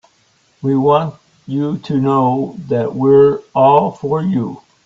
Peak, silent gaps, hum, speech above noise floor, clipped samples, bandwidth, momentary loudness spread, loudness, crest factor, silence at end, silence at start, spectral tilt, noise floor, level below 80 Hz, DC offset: 0 dBFS; none; none; 42 dB; under 0.1%; 7.4 kHz; 10 LU; -15 LUFS; 14 dB; 0.3 s; 0.65 s; -9.5 dB/octave; -56 dBFS; -54 dBFS; under 0.1%